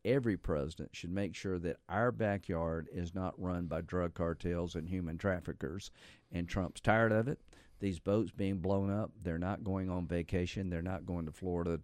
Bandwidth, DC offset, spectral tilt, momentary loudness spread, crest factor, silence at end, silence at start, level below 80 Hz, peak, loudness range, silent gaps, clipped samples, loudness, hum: 13.5 kHz; under 0.1%; -7.5 dB/octave; 8 LU; 22 dB; 0 s; 0.05 s; -56 dBFS; -14 dBFS; 4 LU; none; under 0.1%; -37 LUFS; none